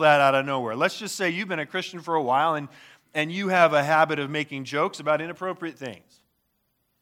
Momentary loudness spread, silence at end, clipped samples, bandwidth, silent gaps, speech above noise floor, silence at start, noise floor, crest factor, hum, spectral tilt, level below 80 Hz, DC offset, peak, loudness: 13 LU; 1.05 s; under 0.1%; 16.5 kHz; none; 49 dB; 0 s; -73 dBFS; 22 dB; none; -4.5 dB/octave; -78 dBFS; under 0.1%; -4 dBFS; -24 LUFS